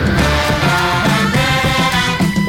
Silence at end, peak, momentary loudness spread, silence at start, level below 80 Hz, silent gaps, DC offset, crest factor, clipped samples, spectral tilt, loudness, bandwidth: 0 s; -4 dBFS; 1 LU; 0 s; -26 dBFS; none; 0.6%; 10 dB; under 0.1%; -4.5 dB/octave; -13 LUFS; 17 kHz